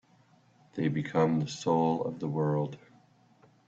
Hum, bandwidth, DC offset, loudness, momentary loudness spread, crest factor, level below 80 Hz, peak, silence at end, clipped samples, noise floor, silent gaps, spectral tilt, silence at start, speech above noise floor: none; 7.8 kHz; under 0.1%; -30 LUFS; 9 LU; 18 dB; -70 dBFS; -14 dBFS; 0.9 s; under 0.1%; -63 dBFS; none; -7 dB/octave; 0.75 s; 34 dB